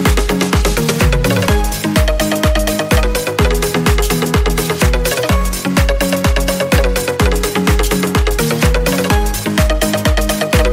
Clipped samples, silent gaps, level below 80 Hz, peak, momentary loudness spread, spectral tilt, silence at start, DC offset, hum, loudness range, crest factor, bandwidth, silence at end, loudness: under 0.1%; none; -18 dBFS; 0 dBFS; 2 LU; -4.5 dB/octave; 0 s; under 0.1%; none; 0 LU; 12 dB; 16.5 kHz; 0 s; -14 LUFS